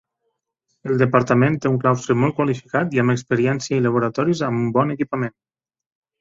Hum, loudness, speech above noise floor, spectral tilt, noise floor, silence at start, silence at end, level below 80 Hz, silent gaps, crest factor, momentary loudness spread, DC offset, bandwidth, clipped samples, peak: none; -20 LUFS; 56 dB; -7 dB/octave; -75 dBFS; 0.85 s; 0.9 s; -56 dBFS; none; 18 dB; 7 LU; under 0.1%; 7.8 kHz; under 0.1%; -2 dBFS